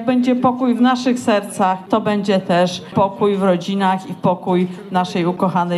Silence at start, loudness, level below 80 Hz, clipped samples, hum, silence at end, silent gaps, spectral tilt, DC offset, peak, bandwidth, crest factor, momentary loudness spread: 0 s; -17 LUFS; -64 dBFS; under 0.1%; none; 0 s; none; -6.5 dB/octave; under 0.1%; -2 dBFS; 12.5 kHz; 14 dB; 4 LU